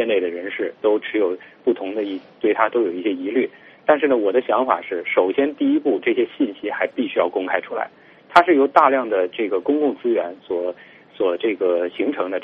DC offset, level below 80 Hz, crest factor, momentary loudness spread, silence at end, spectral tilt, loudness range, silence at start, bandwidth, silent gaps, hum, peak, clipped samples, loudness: under 0.1%; -68 dBFS; 20 dB; 10 LU; 0 s; -2 dB/octave; 3 LU; 0 s; 6.6 kHz; none; none; 0 dBFS; under 0.1%; -20 LUFS